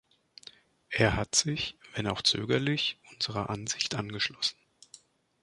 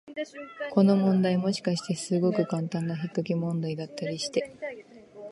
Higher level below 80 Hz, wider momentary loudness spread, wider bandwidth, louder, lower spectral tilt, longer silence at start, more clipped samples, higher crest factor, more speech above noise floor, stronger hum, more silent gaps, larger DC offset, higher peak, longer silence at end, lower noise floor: first, -54 dBFS vs -74 dBFS; second, 9 LU vs 15 LU; about the same, 11.5 kHz vs 11.5 kHz; about the same, -29 LUFS vs -28 LUFS; second, -3 dB/octave vs -6.5 dB/octave; first, 0.9 s vs 0.05 s; neither; about the same, 24 dB vs 20 dB; first, 27 dB vs 20 dB; neither; neither; neither; about the same, -8 dBFS vs -8 dBFS; first, 0.9 s vs 0 s; first, -58 dBFS vs -47 dBFS